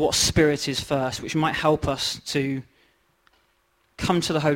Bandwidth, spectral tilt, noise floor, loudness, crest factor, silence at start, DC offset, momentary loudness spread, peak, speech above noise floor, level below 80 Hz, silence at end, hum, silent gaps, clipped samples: 16.5 kHz; -4 dB/octave; -66 dBFS; -23 LUFS; 20 dB; 0 s; under 0.1%; 7 LU; -4 dBFS; 43 dB; -44 dBFS; 0 s; none; none; under 0.1%